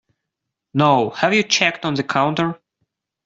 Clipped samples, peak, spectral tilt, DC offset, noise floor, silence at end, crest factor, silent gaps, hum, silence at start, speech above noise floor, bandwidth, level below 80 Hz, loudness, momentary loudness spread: under 0.1%; -2 dBFS; -4 dB/octave; under 0.1%; -81 dBFS; 0.7 s; 18 dB; none; none; 0.75 s; 63 dB; 7.8 kHz; -60 dBFS; -18 LUFS; 9 LU